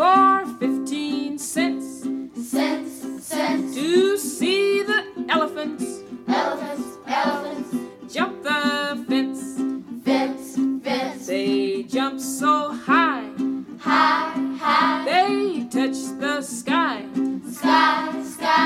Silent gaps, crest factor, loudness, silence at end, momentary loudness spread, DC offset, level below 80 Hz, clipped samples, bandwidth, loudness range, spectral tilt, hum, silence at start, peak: none; 18 dB; -22 LUFS; 0 s; 10 LU; under 0.1%; -66 dBFS; under 0.1%; 15.5 kHz; 4 LU; -3.5 dB/octave; none; 0 s; -6 dBFS